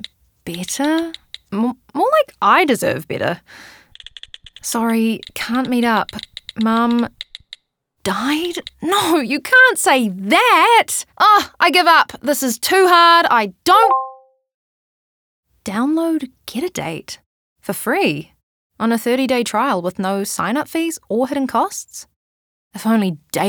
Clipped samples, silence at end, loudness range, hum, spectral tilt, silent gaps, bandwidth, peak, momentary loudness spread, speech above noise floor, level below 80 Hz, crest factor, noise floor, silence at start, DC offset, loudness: under 0.1%; 0 s; 9 LU; none; -3.5 dB/octave; 14.54-15.43 s, 17.26-17.56 s, 18.43-18.70 s, 22.16-22.71 s; over 20 kHz; -2 dBFS; 19 LU; 51 dB; -58 dBFS; 16 dB; -67 dBFS; 0 s; under 0.1%; -16 LUFS